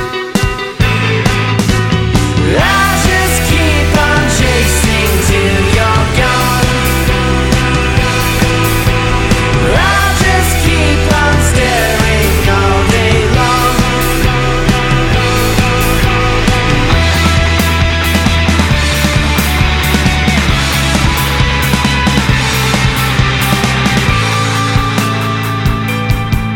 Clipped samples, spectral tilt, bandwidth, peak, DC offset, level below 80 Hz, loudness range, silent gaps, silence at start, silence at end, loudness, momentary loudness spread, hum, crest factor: under 0.1%; -4.5 dB/octave; 17.5 kHz; 0 dBFS; under 0.1%; -18 dBFS; 1 LU; none; 0 s; 0 s; -11 LUFS; 2 LU; none; 10 dB